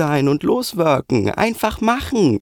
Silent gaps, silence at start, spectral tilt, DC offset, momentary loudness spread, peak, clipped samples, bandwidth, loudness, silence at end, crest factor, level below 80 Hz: none; 0 s; -6 dB/octave; under 0.1%; 2 LU; -4 dBFS; under 0.1%; over 20 kHz; -18 LUFS; 0 s; 14 dB; -40 dBFS